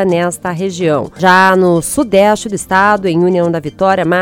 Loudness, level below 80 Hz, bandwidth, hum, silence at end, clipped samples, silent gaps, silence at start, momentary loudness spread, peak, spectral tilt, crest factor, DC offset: -12 LUFS; -44 dBFS; 17.5 kHz; none; 0 s; 0.3%; none; 0 s; 8 LU; 0 dBFS; -5 dB/octave; 12 dB; under 0.1%